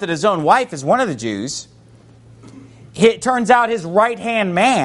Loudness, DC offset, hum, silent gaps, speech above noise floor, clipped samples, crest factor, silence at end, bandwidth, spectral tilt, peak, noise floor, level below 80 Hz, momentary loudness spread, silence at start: -16 LUFS; under 0.1%; none; none; 29 dB; under 0.1%; 18 dB; 0 s; 11.5 kHz; -4.5 dB/octave; 0 dBFS; -45 dBFS; -56 dBFS; 10 LU; 0 s